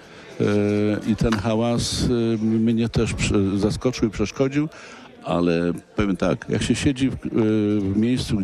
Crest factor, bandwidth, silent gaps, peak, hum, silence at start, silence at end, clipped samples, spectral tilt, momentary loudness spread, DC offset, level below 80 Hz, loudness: 14 dB; 12.5 kHz; none; -8 dBFS; none; 0 s; 0 s; under 0.1%; -6 dB/octave; 5 LU; under 0.1%; -40 dBFS; -22 LUFS